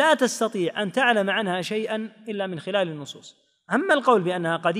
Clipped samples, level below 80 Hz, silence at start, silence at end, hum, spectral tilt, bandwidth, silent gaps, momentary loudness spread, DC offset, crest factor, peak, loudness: under 0.1%; -82 dBFS; 0 s; 0 s; none; -4 dB/octave; 15.5 kHz; none; 11 LU; under 0.1%; 18 dB; -6 dBFS; -23 LUFS